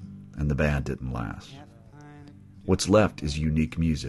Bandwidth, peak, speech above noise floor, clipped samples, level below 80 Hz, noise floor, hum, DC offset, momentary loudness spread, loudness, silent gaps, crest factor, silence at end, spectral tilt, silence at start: 12.5 kHz; -8 dBFS; 22 dB; under 0.1%; -38 dBFS; -48 dBFS; none; under 0.1%; 24 LU; -26 LUFS; none; 20 dB; 0 s; -6 dB/octave; 0 s